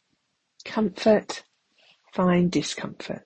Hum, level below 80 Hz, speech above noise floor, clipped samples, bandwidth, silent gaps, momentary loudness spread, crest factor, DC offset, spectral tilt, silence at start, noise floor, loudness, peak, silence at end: none; -60 dBFS; 50 dB; under 0.1%; 8.8 kHz; none; 15 LU; 18 dB; under 0.1%; -6 dB/octave; 0.65 s; -74 dBFS; -24 LUFS; -8 dBFS; 0.05 s